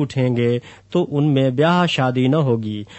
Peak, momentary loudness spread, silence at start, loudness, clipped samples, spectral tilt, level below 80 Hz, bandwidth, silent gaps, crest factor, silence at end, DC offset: -4 dBFS; 6 LU; 0 s; -18 LUFS; under 0.1%; -7.5 dB/octave; -58 dBFS; 8.4 kHz; none; 14 dB; 0 s; under 0.1%